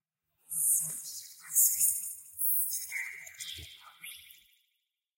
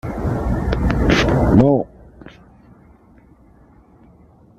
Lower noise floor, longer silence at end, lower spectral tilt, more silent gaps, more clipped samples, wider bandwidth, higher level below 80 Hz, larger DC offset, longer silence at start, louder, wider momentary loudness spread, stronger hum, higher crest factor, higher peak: first, -82 dBFS vs -49 dBFS; second, 0.85 s vs 2.3 s; second, 2.5 dB/octave vs -7 dB/octave; neither; neither; first, 16.5 kHz vs 12.5 kHz; second, -74 dBFS vs -28 dBFS; neither; first, 0.5 s vs 0.05 s; second, -28 LUFS vs -17 LUFS; first, 22 LU vs 10 LU; neither; first, 22 dB vs 16 dB; second, -12 dBFS vs -2 dBFS